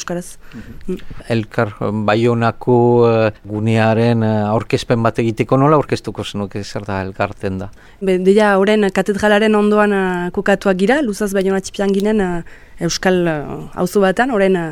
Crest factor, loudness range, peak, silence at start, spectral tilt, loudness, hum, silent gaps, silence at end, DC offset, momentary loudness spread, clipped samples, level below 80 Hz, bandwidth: 14 dB; 3 LU; 0 dBFS; 0 s; -6 dB/octave; -16 LUFS; none; none; 0 s; under 0.1%; 13 LU; under 0.1%; -40 dBFS; 15.5 kHz